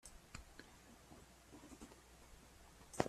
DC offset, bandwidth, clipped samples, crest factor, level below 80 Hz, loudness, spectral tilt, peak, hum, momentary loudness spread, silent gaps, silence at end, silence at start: under 0.1%; 15.5 kHz; under 0.1%; 36 dB; -66 dBFS; -60 LUFS; -4.5 dB/octave; -16 dBFS; none; 6 LU; none; 0 s; 0.05 s